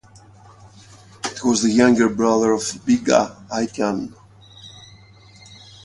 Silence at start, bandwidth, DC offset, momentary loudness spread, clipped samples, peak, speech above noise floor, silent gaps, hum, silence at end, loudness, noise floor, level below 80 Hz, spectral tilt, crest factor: 1.25 s; 11.5 kHz; under 0.1%; 18 LU; under 0.1%; 0 dBFS; 29 dB; none; none; 1.05 s; -19 LUFS; -47 dBFS; -56 dBFS; -4 dB/octave; 20 dB